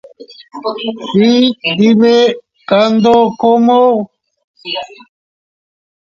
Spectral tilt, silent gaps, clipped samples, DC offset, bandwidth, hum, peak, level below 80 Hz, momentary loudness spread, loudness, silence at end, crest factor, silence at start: -6 dB/octave; 4.44-4.54 s; under 0.1%; under 0.1%; 7.2 kHz; none; 0 dBFS; -56 dBFS; 16 LU; -11 LUFS; 1.25 s; 12 dB; 0.2 s